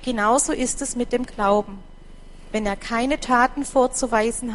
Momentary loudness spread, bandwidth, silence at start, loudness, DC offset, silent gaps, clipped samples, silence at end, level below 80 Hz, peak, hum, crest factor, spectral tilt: 7 LU; 11.5 kHz; 0 s; -22 LUFS; under 0.1%; none; under 0.1%; 0 s; -38 dBFS; -4 dBFS; none; 20 dB; -3 dB/octave